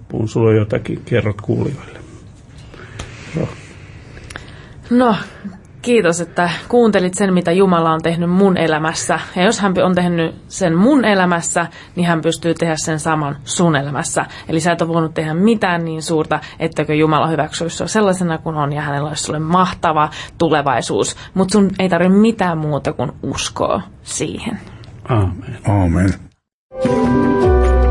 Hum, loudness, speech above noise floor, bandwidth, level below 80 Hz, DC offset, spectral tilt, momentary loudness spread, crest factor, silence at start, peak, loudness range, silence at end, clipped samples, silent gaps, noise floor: none; -16 LUFS; 22 dB; 11.5 kHz; -32 dBFS; under 0.1%; -5.5 dB/octave; 13 LU; 14 dB; 0 s; -2 dBFS; 6 LU; 0 s; under 0.1%; 26.53-26.70 s; -38 dBFS